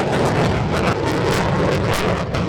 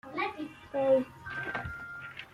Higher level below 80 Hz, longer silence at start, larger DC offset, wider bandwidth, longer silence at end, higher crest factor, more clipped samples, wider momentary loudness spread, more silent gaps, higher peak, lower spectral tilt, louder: first, -34 dBFS vs -60 dBFS; about the same, 0 s vs 0.05 s; neither; first, over 20 kHz vs 11 kHz; about the same, 0 s vs 0 s; about the same, 14 dB vs 18 dB; neither; second, 2 LU vs 15 LU; neither; first, -4 dBFS vs -16 dBFS; about the same, -6 dB/octave vs -6.5 dB/octave; first, -19 LUFS vs -33 LUFS